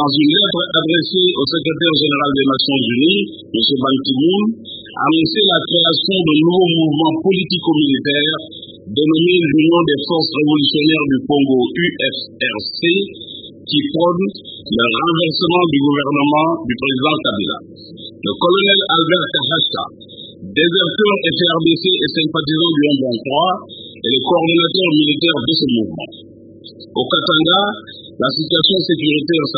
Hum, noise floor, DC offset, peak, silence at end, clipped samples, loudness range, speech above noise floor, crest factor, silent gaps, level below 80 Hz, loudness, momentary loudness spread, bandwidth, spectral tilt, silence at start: none; -39 dBFS; under 0.1%; 0 dBFS; 0 s; under 0.1%; 3 LU; 24 dB; 16 dB; none; -54 dBFS; -14 LUFS; 11 LU; 5 kHz; -10 dB/octave; 0 s